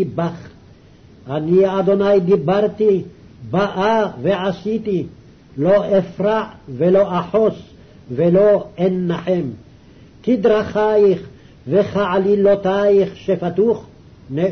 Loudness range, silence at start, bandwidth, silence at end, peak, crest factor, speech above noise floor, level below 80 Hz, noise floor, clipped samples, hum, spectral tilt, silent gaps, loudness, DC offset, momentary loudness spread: 2 LU; 0 s; 6.4 kHz; 0 s; -6 dBFS; 12 dB; 29 dB; -50 dBFS; -45 dBFS; under 0.1%; none; -8.5 dB/octave; none; -17 LUFS; under 0.1%; 11 LU